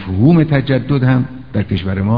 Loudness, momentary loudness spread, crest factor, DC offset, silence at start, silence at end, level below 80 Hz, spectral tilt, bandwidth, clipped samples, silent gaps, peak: -14 LUFS; 9 LU; 14 dB; 1%; 0 s; 0 s; -38 dBFS; -11 dB/octave; 5 kHz; under 0.1%; none; 0 dBFS